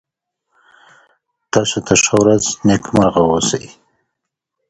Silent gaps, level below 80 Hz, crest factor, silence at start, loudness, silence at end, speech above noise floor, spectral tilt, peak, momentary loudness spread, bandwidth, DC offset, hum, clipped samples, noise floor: none; -46 dBFS; 18 dB; 1.55 s; -14 LUFS; 1.05 s; 64 dB; -4 dB/octave; 0 dBFS; 7 LU; 11.5 kHz; under 0.1%; none; under 0.1%; -78 dBFS